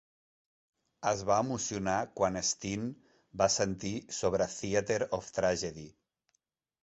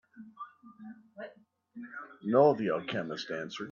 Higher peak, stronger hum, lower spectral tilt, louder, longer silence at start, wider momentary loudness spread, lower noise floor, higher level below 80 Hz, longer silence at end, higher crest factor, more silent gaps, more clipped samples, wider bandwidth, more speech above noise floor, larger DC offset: about the same, -12 dBFS vs -10 dBFS; neither; second, -3.5 dB/octave vs -6.5 dB/octave; about the same, -32 LUFS vs -30 LUFS; first, 1 s vs 0.15 s; second, 9 LU vs 25 LU; first, -81 dBFS vs -58 dBFS; first, -60 dBFS vs -78 dBFS; first, 0.95 s vs 0 s; about the same, 22 dB vs 22 dB; neither; neither; first, 8.4 kHz vs 7.2 kHz; first, 49 dB vs 29 dB; neither